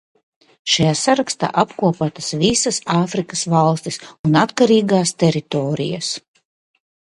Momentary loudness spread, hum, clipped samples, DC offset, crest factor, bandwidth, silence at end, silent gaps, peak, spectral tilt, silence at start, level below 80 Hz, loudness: 9 LU; none; under 0.1%; under 0.1%; 18 dB; 11.5 kHz; 1 s; 4.19-4.24 s; 0 dBFS; -4.5 dB/octave; 0.65 s; -52 dBFS; -18 LUFS